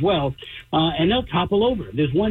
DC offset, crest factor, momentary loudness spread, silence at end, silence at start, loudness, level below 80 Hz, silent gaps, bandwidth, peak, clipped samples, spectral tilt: under 0.1%; 8 dB; 6 LU; 0 s; 0 s; -21 LUFS; -42 dBFS; none; 4.3 kHz; -12 dBFS; under 0.1%; -8.5 dB/octave